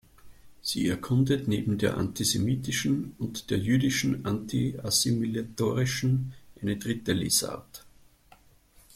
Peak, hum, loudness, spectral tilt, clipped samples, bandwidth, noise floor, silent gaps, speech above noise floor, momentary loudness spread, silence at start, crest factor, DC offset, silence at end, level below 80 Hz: -12 dBFS; none; -28 LUFS; -4.5 dB/octave; under 0.1%; 16 kHz; -59 dBFS; none; 31 dB; 11 LU; 0.25 s; 18 dB; under 0.1%; 1.1 s; -56 dBFS